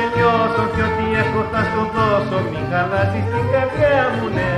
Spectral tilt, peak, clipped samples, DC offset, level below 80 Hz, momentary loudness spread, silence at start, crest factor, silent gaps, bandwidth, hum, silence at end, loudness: -7.5 dB/octave; -4 dBFS; under 0.1%; under 0.1%; -38 dBFS; 5 LU; 0 s; 14 dB; none; 11.5 kHz; none; 0 s; -18 LUFS